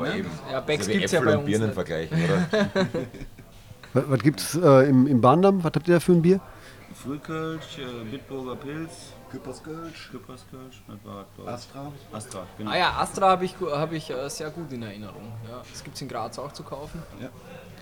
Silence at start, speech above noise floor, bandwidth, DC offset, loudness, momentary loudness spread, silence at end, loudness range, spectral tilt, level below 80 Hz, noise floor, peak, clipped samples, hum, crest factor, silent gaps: 0 s; 22 dB; 20 kHz; 0.1%; -24 LUFS; 22 LU; 0 s; 18 LU; -6 dB/octave; -54 dBFS; -46 dBFS; -4 dBFS; under 0.1%; none; 20 dB; none